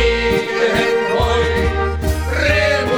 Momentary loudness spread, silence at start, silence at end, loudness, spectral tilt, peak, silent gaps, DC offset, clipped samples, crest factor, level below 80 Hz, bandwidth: 5 LU; 0 s; 0 s; -16 LUFS; -5 dB/octave; -2 dBFS; none; under 0.1%; under 0.1%; 12 dB; -24 dBFS; 19.5 kHz